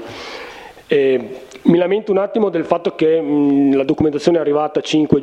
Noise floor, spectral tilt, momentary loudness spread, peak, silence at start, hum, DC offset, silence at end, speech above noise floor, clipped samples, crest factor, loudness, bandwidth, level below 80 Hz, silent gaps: -35 dBFS; -7 dB/octave; 16 LU; 0 dBFS; 0 s; none; under 0.1%; 0 s; 20 dB; under 0.1%; 16 dB; -16 LUFS; 9.4 kHz; -52 dBFS; none